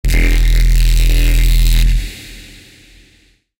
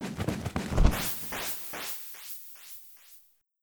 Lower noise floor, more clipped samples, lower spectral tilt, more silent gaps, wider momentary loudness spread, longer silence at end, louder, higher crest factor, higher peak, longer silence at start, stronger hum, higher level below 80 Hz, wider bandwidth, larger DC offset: second, -52 dBFS vs -58 dBFS; neither; about the same, -4.5 dB/octave vs -4.5 dB/octave; neither; about the same, 17 LU vs 18 LU; first, 1.2 s vs 0.45 s; first, -15 LUFS vs -32 LUFS; second, 10 dB vs 26 dB; first, -2 dBFS vs -6 dBFS; about the same, 0.05 s vs 0 s; neither; first, -12 dBFS vs -36 dBFS; second, 17 kHz vs over 20 kHz; neither